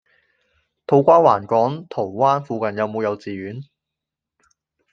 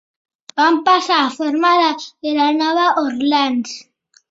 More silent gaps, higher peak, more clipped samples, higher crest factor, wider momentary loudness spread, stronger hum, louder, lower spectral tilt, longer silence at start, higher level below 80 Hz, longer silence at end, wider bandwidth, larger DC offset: neither; about the same, -2 dBFS vs -2 dBFS; neither; about the same, 18 dB vs 16 dB; first, 17 LU vs 10 LU; neither; about the same, -18 LUFS vs -16 LUFS; first, -8 dB/octave vs -2.5 dB/octave; first, 0.9 s vs 0.55 s; about the same, -66 dBFS vs -68 dBFS; first, 1.3 s vs 0.5 s; second, 6.8 kHz vs 8 kHz; neither